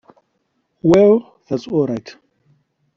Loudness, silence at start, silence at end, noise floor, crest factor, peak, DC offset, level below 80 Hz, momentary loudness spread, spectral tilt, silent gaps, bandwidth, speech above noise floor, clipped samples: -16 LUFS; 0.85 s; 0.85 s; -68 dBFS; 18 dB; -2 dBFS; under 0.1%; -54 dBFS; 14 LU; -7.5 dB/octave; none; 7.6 kHz; 54 dB; under 0.1%